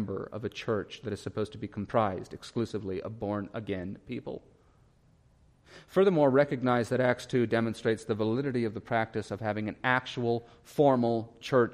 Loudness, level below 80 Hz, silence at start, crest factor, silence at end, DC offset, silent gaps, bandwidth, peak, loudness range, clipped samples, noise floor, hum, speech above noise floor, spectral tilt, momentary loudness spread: -30 LUFS; -64 dBFS; 0 s; 20 dB; 0 s; under 0.1%; none; 14.5 kHz; -10 dBFS; 10 LU; under 0.1%; -63 dBFS; none; 33 dB; -7 dB/octave; 13 LU